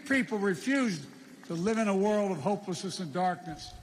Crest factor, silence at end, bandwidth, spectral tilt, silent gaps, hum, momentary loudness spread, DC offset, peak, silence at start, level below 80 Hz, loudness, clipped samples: 14 dB; 0 s; 15 kHz; -5.5 dB/octave; none; none; 12 LU; under 0.1%; -16 dBFS; 0 s; -62 dBFS; -31 LUFS; under 0.1%